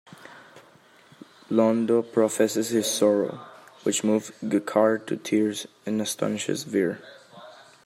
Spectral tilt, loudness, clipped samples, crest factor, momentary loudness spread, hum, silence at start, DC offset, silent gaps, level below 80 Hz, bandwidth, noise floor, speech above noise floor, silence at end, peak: -4.5 dB/octave; -25 LUFS; under 0.1%; 18 dB; 9 LU; none; 0.2 s; under 0.1%; none; -76 dBFS; 16 kHz; -55 dBFS; 31 dB; 0.35 s; -8 dBFS